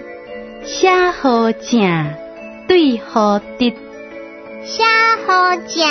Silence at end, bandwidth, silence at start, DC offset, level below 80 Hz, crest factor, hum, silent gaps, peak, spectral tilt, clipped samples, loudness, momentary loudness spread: 0 s; 6.4 kHz; 0 s; under 0.1%; -52 dBFS; 16 dB; none; none; 0 dBFS; -4.5 dB/octave; under 0.1%; -14 LUFS; 20 LU